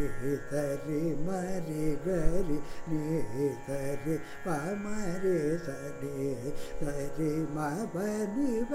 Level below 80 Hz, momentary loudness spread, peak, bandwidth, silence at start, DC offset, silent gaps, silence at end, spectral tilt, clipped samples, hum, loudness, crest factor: -42 dBFS; 6 LU; -12 dBFS; 15 kHz; 0 s; under 0.1%; none; 0 s; -7 dB/octave; under 0.1%; none; -34 LUFS; 20 dB